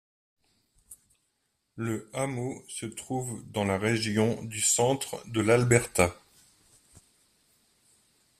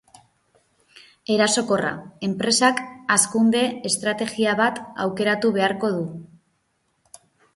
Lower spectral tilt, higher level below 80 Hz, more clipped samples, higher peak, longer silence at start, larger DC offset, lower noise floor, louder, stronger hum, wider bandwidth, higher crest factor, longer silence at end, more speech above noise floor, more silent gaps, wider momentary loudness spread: first, -4.5 dB/octave vs -3 dB/octave; about the same, -60 dBFS vs -64 dBFS; neither; second, -8 dBFS vs -4 dBFS; about the same, 0.9 s vs 0.95 s; neither; first, -77 dBFS vs -70 dBFS; second, -28 LUFS vs -21 LUFS; neither; first, 14.5 kHz vs 12 kHz; about the same, 24 dB vs 20 dB; first, 2.25 s vs 1.3 s; about the same, 49 dB vs 48 dB; neither; about the same, 12 LU vs 10 LU